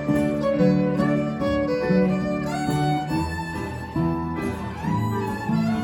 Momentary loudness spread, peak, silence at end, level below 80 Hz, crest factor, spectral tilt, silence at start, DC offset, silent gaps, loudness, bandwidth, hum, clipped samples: 8 LU; -8 dBFS; 0 s; -42 dBFS; 16 dB; -7.5 dB/octave; 0 s; under 0.1%; none; -24 LUFS; 17 kHz; none; under 0.1%